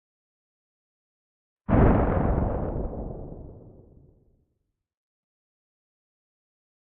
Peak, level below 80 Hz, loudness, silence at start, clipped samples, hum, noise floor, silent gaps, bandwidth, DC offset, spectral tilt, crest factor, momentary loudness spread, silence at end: -6 dBFS; -34 dBFS; -25 LUFS; 1.7 s; under 0.1%; none; -78 dBFS; none; 3.6 kHz; under 0.1%; -10 dB/octave; 22 dB; 22 LU; 3.3 s